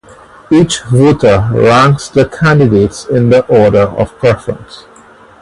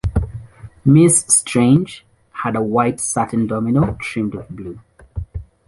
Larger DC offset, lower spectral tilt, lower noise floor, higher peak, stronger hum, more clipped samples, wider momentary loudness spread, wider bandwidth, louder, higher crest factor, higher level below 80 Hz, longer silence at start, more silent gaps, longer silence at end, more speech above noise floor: neither; about the same, -6.5 dB/octave vs -5.5 dB/octave; about the same, -39 dBFS vs -36 dBFS; about the same, 0 dBFS vs 0 dBFS; neither; first, 0.1% vs under 0.1%; second, 5 LU vs 21 LU; about the same, 11.5 kHz vs 11.5 kHz; first, -9 LUFS vs -16 LUFS; second, 10 dB vs 16 dB; about the same, -34 dBFS vs -34 dBFS; first, 0.5 s vs 0.05 s; neither; first, 0.6 s vs 0.25 s; first, 30 dB vs 20 dB